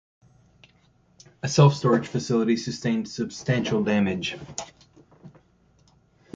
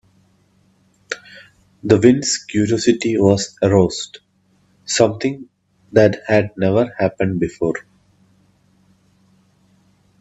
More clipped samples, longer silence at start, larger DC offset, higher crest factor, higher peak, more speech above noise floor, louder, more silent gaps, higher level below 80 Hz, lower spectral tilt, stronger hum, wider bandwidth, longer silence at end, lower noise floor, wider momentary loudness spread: neither; first, 1.45 s vs 1.1 s; neither; about the same, 22 dB vs 20 dB; second, -4 dBFS vs 0 dBFS; second, 38 dB vs 43 dB; second, -24 LUFS vs -17 LUFS; neither; about the same, -58 dBFS vs -54 dBFS; about the same, -6 dB/octave vs -5 dB/octave; neither; about the same, 7.8 kHz vs 8.4 kHz; second, 1.05 s vs 2.4 s; about the same, -61 dBFS vs -59 dBFS; about the same, 16 LU vs 16 LU